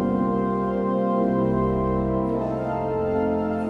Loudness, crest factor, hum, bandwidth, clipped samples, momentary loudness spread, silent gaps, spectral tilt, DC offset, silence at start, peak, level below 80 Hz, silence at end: -24 LUFS; 12 dB; none; 5.6 kHz; under 0.1%; 4 LU; none; -10.5 dB/octave; under 0.1%; 0 s; -10 dBFS; -40 dBFS; 0 s